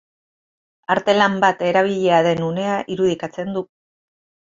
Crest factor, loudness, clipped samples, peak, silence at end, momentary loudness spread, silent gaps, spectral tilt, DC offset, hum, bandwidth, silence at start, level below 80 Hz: 18 dB; -19 LUFS; under 0.1%; -2 dBFS; 0.95 s; 11 LU; none; -5.5 dB/octave; under 0.1%; none; 7.8 kHz; 0.9 s; -60 dBFS